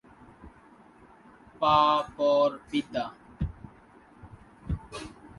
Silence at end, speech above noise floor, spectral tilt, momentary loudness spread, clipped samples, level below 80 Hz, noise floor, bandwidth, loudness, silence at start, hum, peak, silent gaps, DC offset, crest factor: 0.1 s; 30 dB; -6 dB/octave; 20 LU; under 0.1%; -48 dBFS; -55 dBFS; 11.5 kHz; -27 LUFS; 0.45 s; none; -10 dBFS; none; under 0.1%; 22 dB